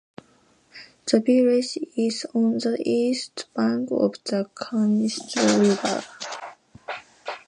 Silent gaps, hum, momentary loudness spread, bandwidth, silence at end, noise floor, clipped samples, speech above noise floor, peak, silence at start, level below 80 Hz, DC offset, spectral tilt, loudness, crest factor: none; none; 17 LU; 10.5 kHz; 0.1 s; -60 dBFS; under 0.1%; 37 dB; -4 dBFS; 0.75 s; -72 dBFS; under 0.1%; -4.5 dB/octave; -23 LUFS; 20 dB